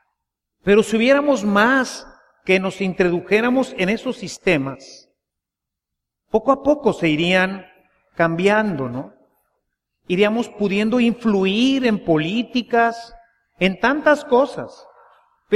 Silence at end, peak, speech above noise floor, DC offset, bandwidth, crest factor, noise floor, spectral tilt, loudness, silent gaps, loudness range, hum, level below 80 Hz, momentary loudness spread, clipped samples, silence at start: 0 s; -2 dBFS; 66 dB; under 0.1%; 13 kHz; 16 dB; -84 dBFS; -5.5 dB/octave; -18 LUFS; none; 4 LU; none; -52 dBFS; 12 LU; under 0.1%; 0.65 s